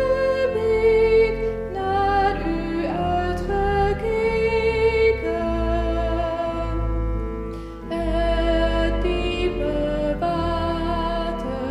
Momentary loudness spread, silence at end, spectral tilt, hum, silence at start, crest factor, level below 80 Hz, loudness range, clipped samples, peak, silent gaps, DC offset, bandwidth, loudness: 8 LU; 0 s; -7 dB/octave; none; 0 s; 14 dB; -30 dBFS; 3 LU; under 0.1%; -8 dBFS; none; under 0.1%; 11 kHz; -22 LUFS